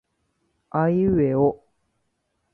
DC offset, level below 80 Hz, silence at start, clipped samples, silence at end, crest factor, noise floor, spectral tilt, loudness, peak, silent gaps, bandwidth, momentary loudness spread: under 0.1%; -50 dBFS; 0.75 s; under 0.1%; 1 s; 16 dB; -74 dBFS; -12 dB/octave; -22 LUFS; -8 dBFS; none; 4.2 kHz; 4 LU